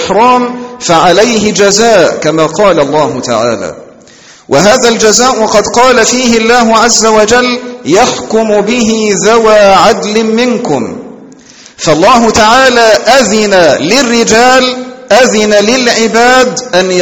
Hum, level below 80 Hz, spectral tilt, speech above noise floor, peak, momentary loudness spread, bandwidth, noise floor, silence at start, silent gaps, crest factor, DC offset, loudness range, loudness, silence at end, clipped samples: none; -38 dBFS; -3 dB/octave; 30 dB; 0 dBFS; 7 LU; over 20 kHz; -36 dBFS; 0 s; none; 6 dB; under 0.1%; 3 LU; -6 LUFS; 0 s; 4%